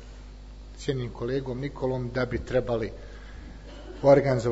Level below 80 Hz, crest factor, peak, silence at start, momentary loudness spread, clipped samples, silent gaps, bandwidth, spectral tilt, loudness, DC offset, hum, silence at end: -42 dBFS; 22 dB; -6 dBFS; 0 s; 26 LU; under 0.1%; none; 8 kHz; -7 dB/octave; -27 LUFS; under 0.1%; 50 Hz at -45 dBFS; 0 s